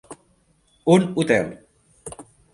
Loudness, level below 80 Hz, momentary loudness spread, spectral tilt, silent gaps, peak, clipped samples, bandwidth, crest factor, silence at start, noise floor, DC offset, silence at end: -20 LUFS; -58 dBFS; 22 LU; -6 dB/octave; none; -2 dBFS; under 0.1%; 11.5 kHz; 20 dB; 0.1 s; -62 dBFS; under 0.1%; 0.3 s